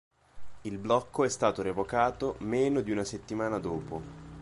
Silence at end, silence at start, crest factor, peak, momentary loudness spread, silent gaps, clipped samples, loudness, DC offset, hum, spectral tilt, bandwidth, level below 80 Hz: 0 s; 0.35 s; 20 dB; -12 dBFS; 13 LU; none; under 0.1%; -31 LUFS; under 0.1%; none; -5.5 dB/octave; 11.5 kHz; -56 dBFS